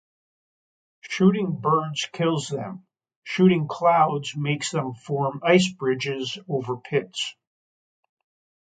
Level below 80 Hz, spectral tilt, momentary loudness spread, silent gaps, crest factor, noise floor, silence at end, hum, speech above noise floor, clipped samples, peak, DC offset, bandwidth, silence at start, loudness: -68 dBFS; -5.5 dB/octave; 12 LU; 3.16-3.22 s; 20 dB; under -90 dBFS; 1.3 s; none; over 67 dB; under 0.1%; -4 dBFS; under 0.1%; 9.4 kHz; 1.05 s; -24 LUFS